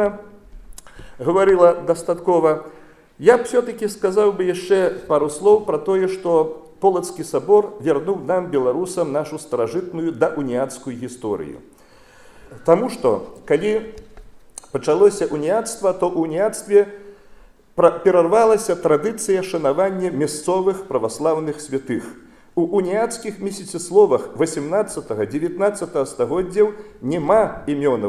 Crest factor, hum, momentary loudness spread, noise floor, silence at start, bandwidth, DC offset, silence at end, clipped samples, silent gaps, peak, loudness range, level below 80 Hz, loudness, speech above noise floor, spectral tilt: 20 dB; none; 11 LU; -47 dBFS; 0 s; 13.5 kHz; under 0.1%; 0 s; under 0.1%; none; 0 dBFS; 5 LU; -52 dBFS; -19 LUFS; 29 dB; -5.5 dB/octave